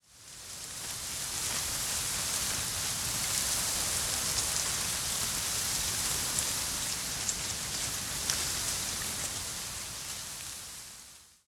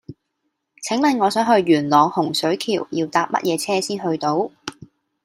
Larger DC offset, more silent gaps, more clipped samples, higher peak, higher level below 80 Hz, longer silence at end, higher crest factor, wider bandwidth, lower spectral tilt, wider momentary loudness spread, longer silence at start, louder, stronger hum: neither; neither; neither; second, -8 dBFS vs -2 dBFS; first, -52 dBFS vs -66 dBFS; second, 0.2 s vs 0.4 s; first, 26 dB vs 18 dB; about the same, 17.5 kHz vs 16 kHz; second, -0.5 dB/octave vs -4.5 dB/octave; about the same, 11 LU vs 9 LU; about the same, 0.1 s vs 0.1 s; second, -31 LUFS vs -19 LUFS; neither